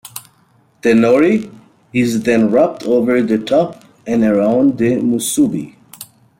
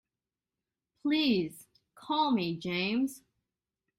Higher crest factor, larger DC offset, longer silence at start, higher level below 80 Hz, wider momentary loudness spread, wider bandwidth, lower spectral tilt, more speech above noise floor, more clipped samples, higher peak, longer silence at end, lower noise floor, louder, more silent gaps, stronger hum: about the same, 14 dB vs 16 dB; neither; second, 0.05 s vs 1.05 s; first, -56 dBFS vs -72 dBFS; first, 21 LU vs 8 LU; about the same, 16.5 kHz vs 16 kHz; about the same, -5.5 dB/octave vs -5.5 dB/octave; second, 41 dB vs over 60 dB; neither; first, -2 dBFS vs -16 dBFS; second, 0.35 s vs 0.8 s; second, -54 dBFS vs under -90 dBFS; first, -14 LUFS vs -31 LUFS; neither; neither